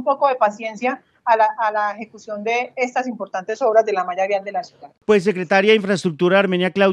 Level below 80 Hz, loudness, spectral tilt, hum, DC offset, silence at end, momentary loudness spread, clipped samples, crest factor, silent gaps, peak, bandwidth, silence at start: -70 dBFS; -19 LUFS; -5.5 dB/octave; none; under 0.1%; 0 s; 11 LU; under 0.1%; 16 dB; none; -2 dBFS; 10.5 kHz; 0 s